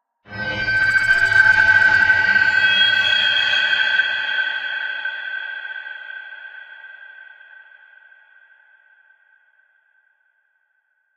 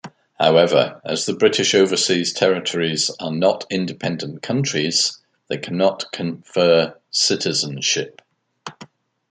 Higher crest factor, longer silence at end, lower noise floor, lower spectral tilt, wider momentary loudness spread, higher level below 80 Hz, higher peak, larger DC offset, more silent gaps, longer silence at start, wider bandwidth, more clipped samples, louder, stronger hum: about the same, 20 dB vs 18 dB; first, 3.9 s vs 0.45 s; first, -67 dBFS vs -45 dBFS; second, -1.5 dB/octave vs -3.5 dB/octave; first, 22 LU vs 11 LU; first, -52 dBFS vs -66 dBFS; about the same, -2 dBFS vs -2 dBFS; neither; neither; first, 0.3 s vs 0.05 s; first, 11.5 kHz vs 9.6 kHz; neither; first, -15 LUFS vs -19 LUFS; neither